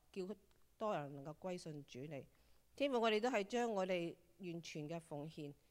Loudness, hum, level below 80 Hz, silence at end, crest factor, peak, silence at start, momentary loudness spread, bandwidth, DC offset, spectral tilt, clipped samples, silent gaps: -43 LUFS; none; -78 dBFS; 0.2 s; 18 dB; -26 dBFS; 0.15 s; 15 LU; 16 kHz; under 0.1%; -5 dB/octave; under 0.1%; none